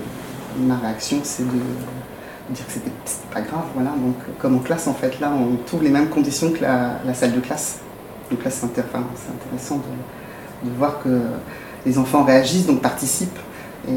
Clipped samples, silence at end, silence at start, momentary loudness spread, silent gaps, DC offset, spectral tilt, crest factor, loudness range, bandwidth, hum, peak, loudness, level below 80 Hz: under 0.1%; 0 s; 0 s; 15 LU; none; under 0.1%; -5 dB/octave; 20 dB; 6 LU; 17.5 kHz; none; -2 dBFS; -21 LUFS; -52 dBFS